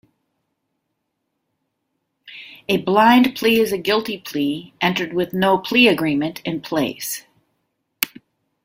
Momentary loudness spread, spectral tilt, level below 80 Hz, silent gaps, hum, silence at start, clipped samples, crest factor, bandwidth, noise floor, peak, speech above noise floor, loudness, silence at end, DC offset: 13 LU; -4.5 dB/octave; -60 dBFS; none; none; 2.25 s; under 0.1%; 20 dB; 16.5 kHz; -75 dBFS; 0 dBFS; 57 dB; -18 LUFS; 0.6 s; under 0.1%